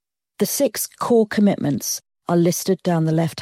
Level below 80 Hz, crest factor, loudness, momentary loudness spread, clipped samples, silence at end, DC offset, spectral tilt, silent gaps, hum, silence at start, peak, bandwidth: -64 dBFS; 14 dB; -20 LUFS; 7 LU; under 0.1%; 0 s; under 0.1%; -5.5 dB/octave; none; none; 0.4 s; -6 dBFS; 16.5 kHz